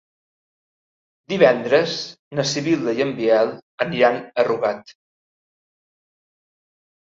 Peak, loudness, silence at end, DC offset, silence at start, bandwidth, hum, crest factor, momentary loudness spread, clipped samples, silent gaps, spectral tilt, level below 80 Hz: -2 dBFS; -20 LUFS; 2.1 s; under 0.1%; 1.3 s; 7.8 kHz; none; 20 dB; 11 LU; under 0.1%; 2.19-2.31 s, 3.62-3.78 s; -4.5 dB/octave; -66 dBFS